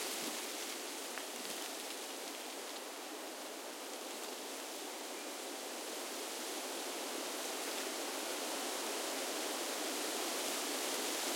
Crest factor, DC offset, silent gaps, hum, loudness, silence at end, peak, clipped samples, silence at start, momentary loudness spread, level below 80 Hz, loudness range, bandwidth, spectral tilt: 20 dB; under 0.1%; none; none; -40 LUFS; 0 s; -22 dBFS; under 0.1%; 0 s; 7 LU; under -90 dBFS; 6 LU; 16.5 kHz; 0.5 dB/octave